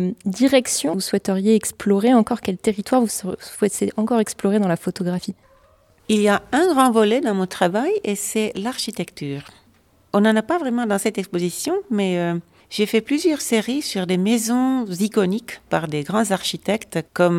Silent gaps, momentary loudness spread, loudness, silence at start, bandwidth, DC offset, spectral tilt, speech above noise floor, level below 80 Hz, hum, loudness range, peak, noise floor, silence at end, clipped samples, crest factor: none; 8 LU; -20 LUFS; 0 s; 16.5 kHz; under 0.1%; -5 dB/octave; 37 dB; -58 dBFS; none; 3 LU; -2 dBFS; -57 dBFS; 0 s; under 0.1%; 18 dB